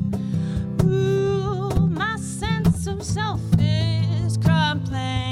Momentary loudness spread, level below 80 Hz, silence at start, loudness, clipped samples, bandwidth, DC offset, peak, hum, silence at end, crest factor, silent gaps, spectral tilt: 6 LU; -36 dBFS; 0 s; -22 LUFS; under 0.1%; 13 kHz; under 0.1%; -6 dBFS; none; 0 s; 14 dB; none; -6.5 dB/octave